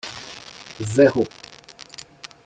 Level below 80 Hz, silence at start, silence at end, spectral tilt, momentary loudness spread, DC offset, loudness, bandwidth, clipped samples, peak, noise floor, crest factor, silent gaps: -58 dBFS; 0.05 s; 0.2 s; -5.5 dB/octave; 25 LU; under 0.1%; -19 LUFS; 9.4 kHz; under 0.1%; -2 dBFS; -44 dBFS; 22 dB; none